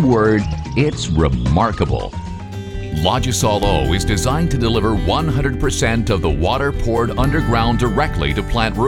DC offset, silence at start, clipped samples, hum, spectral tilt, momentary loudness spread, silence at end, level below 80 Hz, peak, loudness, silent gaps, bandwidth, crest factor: under 0.1%; 0 s; under 0.1%; none; -5.5 dB/octave; 5 LU; 0 s; -24 dBFS; 0 dBFS; -17 LUFS; none; 17 kHz; 16 dB